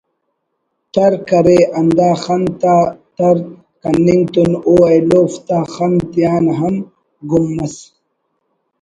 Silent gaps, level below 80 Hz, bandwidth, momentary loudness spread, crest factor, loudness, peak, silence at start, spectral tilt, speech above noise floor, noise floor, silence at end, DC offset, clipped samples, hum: none; -46 dBFS; 10.5 kHz; 12 LU; 14 dB; -13 LUFS; 0 dBFS; 0.95 s; -7.5 dB/octave; 57 dB; -70 dBFS; 1 s; under 0.1%; under 0.1%; none